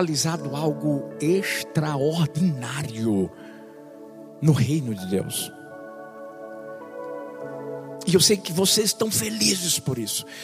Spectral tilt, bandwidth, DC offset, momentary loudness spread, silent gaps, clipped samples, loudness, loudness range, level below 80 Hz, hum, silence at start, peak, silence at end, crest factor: -4 dB/octave; 15.5 kHz; under 0.1%; 21 LU; none; under 0.1%; -23 LUFS; 6 LU; -64 dBFS; none; 0 s; -4 dBFS; 0 s; 20 dB